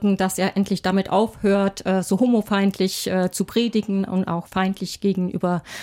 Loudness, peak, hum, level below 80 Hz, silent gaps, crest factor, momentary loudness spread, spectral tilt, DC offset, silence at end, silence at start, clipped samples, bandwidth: -22 LUFS; -6 dBFS; none; -54 dBFS; none; 14 dB; 5 LU; -5.5 dB/octave; under 0.1%; 0 s; 0 s; under 0.1%; 16.5 kHz